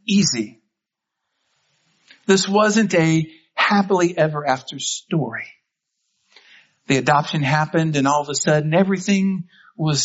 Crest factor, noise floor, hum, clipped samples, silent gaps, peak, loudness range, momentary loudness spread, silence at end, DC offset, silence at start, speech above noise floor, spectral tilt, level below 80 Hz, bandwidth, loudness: 18 dB; -82 dBFS; none; under 0.1%; none; -2 dBFS; 4 LU; 11 LU; 0 s; under 0.1%; 0.05 s; 64 dB; -4.5 dB/octave; -62 dBFS; 8 kHz; -19 LUFS